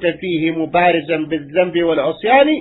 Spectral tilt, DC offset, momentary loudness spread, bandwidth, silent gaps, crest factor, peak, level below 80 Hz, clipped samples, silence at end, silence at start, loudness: -9.5 dB/octave; under 0.1%; 7 LU; 4.1 kHz; none; 14 dB; -2 dBFS; -52 dBFS; under 0.1%; 0 s; 0 s; -16 LUFS